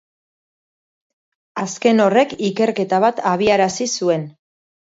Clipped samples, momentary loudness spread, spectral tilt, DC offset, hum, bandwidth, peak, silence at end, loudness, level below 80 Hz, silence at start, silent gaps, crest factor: under 0.1%; 12 LU; -4.5 dB/octave; under 0.1%; none; 7.8 kHz; -2 dBFS; 0.65 s; -17 LUFS; -60 dBFS; 1.55 s; none; 18 dB